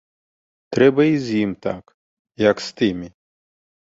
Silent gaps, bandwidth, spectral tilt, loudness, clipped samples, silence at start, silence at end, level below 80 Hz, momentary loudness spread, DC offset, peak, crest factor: 1.94-2.25 s; 7.8 kHz; -6.5 dB/octave; -19 LUFS; under 0.1%; 0.7 s; 0.9 s; -56 dBFS; 16 LU; under 0.1%; -2 dBFS; 20 dB